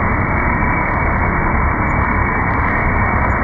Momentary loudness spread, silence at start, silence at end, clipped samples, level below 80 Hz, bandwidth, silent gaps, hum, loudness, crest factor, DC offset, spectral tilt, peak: 1 LU; 0 s; 0 s; under 0.1%; -22 dBFS; 4.4 kHz; none; none; -16 LUFS; 12 dB; under 0.1%; -10 dB/octave; -2 dBFS